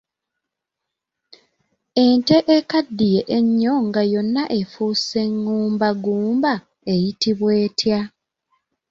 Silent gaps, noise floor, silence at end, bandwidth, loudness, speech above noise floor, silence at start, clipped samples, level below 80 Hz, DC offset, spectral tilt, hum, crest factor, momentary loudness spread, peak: none; -82 dBFS; 0.8 s; 7.6 kHz; -19 LUFS; 64 dB; 1.95 s; under 0.1%; -58 dBFS; under 0.1%; -6 dB/octave; none; 18 dB; 7 LU; -2 dBFS